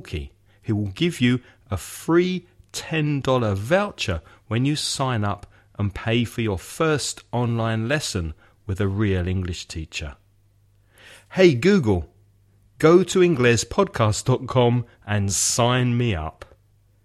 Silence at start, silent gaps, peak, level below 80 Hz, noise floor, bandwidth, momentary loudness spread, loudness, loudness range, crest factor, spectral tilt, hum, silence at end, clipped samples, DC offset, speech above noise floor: 0.05 s; none; -2 dBFS; -44 dBFS; -59 dBFS; 14.5 kHz; 15 LU; -22 LUFS; 6 LU; 20 dB; -5 dB/octave; none; 0.6 s; under 0.1%; under 0.1%; 37 dB